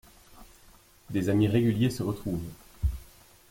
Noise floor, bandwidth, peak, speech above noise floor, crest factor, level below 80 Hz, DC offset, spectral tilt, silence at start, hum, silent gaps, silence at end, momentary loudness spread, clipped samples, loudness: -57 dBFS; 16.5 kHz; -12 dBFS; 30 dB; 18 dB; -42 dBFS; under 0.1%; -7.5 dB/octave; 0.35 s; none; none; 0.45 s; 12 LU; under 0.1%; -28 LUFS